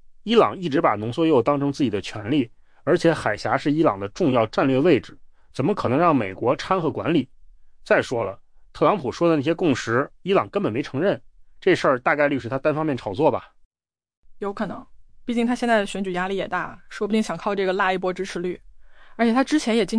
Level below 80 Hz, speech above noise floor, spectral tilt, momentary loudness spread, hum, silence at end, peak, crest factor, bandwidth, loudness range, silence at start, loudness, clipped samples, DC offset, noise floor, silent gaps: -52 dBFS; 24 dB; -6 dB/octave; 10 LU; none; 0 s; -6 dBFS; 16 dB; 10.5 kHz; 4 LU; 0.05 s; -22 LUFS; under 0.1%; under 0.1%; -45 dBFS; 13.65-13.71 s, 14.17-14.23 s